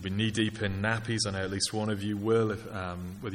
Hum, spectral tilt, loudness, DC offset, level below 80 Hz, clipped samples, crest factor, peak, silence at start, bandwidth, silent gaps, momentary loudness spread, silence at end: none; -4.5 dB/octave; -30 LUFS; under 0.1%; -54 dBFS; under 0.1%; 16 dB; -14 dBFS; 0 s; 15.5 kHz; none; 9 LU; 0 s